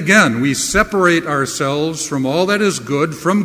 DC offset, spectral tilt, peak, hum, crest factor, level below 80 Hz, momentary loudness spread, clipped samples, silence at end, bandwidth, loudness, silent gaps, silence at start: under 0.1%; -4 dB/octave; 0 dBFS; none; 16 dB; -40 dBFS; 7 LU; under 0.1%; 0 s; 16 kHz; -15 LUFS; none; 0 s